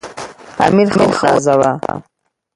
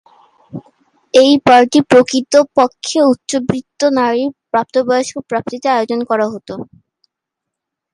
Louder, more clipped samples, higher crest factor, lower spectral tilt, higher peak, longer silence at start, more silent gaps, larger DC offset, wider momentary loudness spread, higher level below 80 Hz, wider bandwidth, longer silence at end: about the same, -13 LUFS vs -13 LUFS; neither; about the same, 14 dB vs 14 dB; first, -5.5 dB/octave vs -4 dB/octave; about the same, 0 dBFS vs 0 dBFS; second, 0.05 s vs 0.55 s; neither; neither; about the same, 18 LU vs 17 LU; first, -48 dBFS vs -56 dBFS; about the same, 11.5 kHz vs 11.5 kHz; second, 0.55 s vs 1.3 s